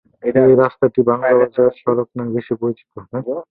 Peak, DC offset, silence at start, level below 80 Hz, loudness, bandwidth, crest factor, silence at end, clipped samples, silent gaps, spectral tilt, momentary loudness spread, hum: -2 dBFS; under 0.1%; 0.25 s; -56 dBFS; -16 LUFS; 4.1 kHz; 14 dB; 0.1 s; under 0.1%; none; -11.5 dB/octave; 12 LU; none